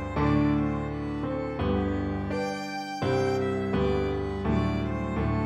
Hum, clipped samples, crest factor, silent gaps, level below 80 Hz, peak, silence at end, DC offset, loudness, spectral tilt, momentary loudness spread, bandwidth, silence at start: none; under 0.1%; 14 dB; none; -38 dBFS; -14 dBFS; 0 s; under 0.1%; -28 LUFS; -7.5 dB/octave; 6 LU; 11 kHz; 0 s